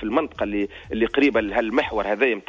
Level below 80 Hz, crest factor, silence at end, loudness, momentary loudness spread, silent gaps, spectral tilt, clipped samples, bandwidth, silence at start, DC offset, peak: -46 dBFS; 16 dB; 0.05 s; -22 LUFS; 7 LU; none; -6 dB/octave; under 0.1%; 7.6 kHz; 0 s; under 0.1%; -6 dBFS